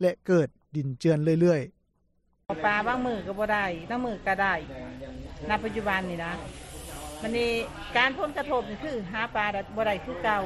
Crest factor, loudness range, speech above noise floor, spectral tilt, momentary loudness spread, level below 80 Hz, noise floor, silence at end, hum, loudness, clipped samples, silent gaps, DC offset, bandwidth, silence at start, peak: 20 dB; 4 LU; 42 dB; -6 dB/octave; 15 LU; -50 dBFS; -69 dBFS; 0 s; none; -28 LUFS; under 0.1%; none; under 0.1%; 13.5 kHz; 0 s; -8 dBFS